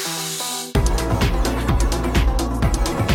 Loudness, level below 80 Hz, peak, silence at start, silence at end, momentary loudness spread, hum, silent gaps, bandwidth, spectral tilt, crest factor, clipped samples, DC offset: -21 LUFS; -22 dBFS; -4 dBFS; 0 s; 0 s; 3 LU; none; none; 17.5 kHz; -4.5 dB/octave; 14 dB; under 0.1%; under 0.1%